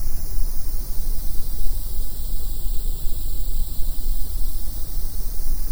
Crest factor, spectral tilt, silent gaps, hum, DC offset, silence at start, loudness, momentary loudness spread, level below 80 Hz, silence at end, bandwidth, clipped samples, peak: 12 dB; -4.5 dB/octave; none; none; under 0.1%; 0 s; -29 LUFS; 1 LU; -22 dBFS; 0 s; over 20 kHz; under 0.1%; -4 dBFS